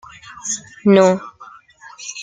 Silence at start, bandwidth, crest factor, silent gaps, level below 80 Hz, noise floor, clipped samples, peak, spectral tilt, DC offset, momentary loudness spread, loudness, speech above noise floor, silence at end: 0.45 s; 9.4 kHz; 18 dB; none; -60 dBFS; -43 dBFS; under 0.1%; -2 dBFS; -5 dB/octave; under 0.1%; 23 LU; -16 LUFS; 27 dB; 0 s